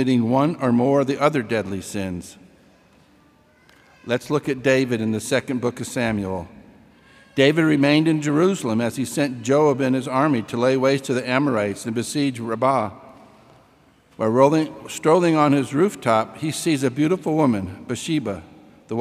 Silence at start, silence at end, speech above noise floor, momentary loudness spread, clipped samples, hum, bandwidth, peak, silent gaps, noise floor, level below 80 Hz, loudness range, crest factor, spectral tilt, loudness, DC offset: 0 s; 0 s; 35 dB; 11 LU; under 0.1%; none; 15.5 kHz; -2 dBFS; none; -55 dBFS; -60 dBFS; 5 LU; 20 dB; -6 dB/octave; -21 LUFS; under 0.1%